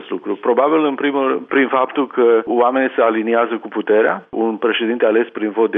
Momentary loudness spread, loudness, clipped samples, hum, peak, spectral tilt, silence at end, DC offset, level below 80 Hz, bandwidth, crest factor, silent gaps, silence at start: 6 LU; -16 LUFS; under 0.1%; none; -4 dBFS; -8.5 dB/octave; 0 s; under 0.1%; -70 dBFS; 3.8 kHz; 12 dB; none; 0 s